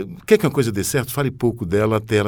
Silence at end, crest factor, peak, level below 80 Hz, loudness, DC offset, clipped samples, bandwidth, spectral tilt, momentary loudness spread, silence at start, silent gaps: 0 s; 20 dB; 0 dBFS; -46 dBFS; -19 LUFS; under 0.1%; under 0.1%; over 20 kHz; -5.5 dB/octave; 5 LU; 0 s; none